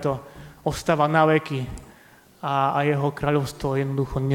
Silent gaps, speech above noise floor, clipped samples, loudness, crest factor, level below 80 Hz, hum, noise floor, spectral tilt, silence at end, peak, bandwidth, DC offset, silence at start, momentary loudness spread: none; 30 dB; under 0.1%; -23 LUFS; 18 dB; -46 dBFS; none; -52 dBFS; -6.5 dB/octave; 0 s; -4 dBFS; 16.5 kHz; under 0.1%; 0 s; 14 LU